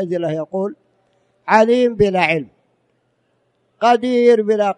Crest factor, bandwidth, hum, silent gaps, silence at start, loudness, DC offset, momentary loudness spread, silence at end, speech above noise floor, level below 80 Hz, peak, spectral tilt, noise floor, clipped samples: 18 dB; 9.8 kHz; none; none; 0 s; -16 LUFS; under 0.1%; 11 LU; 0.05 s; 49 dB; -52 dBFS; 0 dBFS; -6 dB/octave; -65 dBFS; under 0.1%